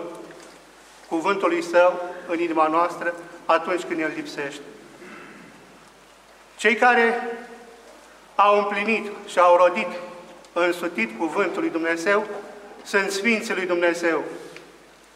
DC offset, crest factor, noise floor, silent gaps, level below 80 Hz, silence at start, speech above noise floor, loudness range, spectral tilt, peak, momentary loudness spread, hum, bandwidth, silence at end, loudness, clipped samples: under 0.1%; 20 dB; -50 dBFS; none; -68 dBFS; 0 s; 29 dB; 5 LU; -4 dB/octave; -4 dBFS; 22 LU; none; 15 kHz; 0.5 s; -22 LUFS; under 0.1%